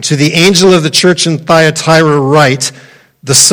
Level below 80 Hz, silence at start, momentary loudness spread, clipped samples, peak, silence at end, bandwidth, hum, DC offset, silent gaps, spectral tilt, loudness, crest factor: -46 dBFS; 0 s; 6 LU; 1%; 0 dBFS; 0 s; over 20 kHz; none; under 0.1%; none; -3.5 dB/octave; -7 LUFS; 8 dB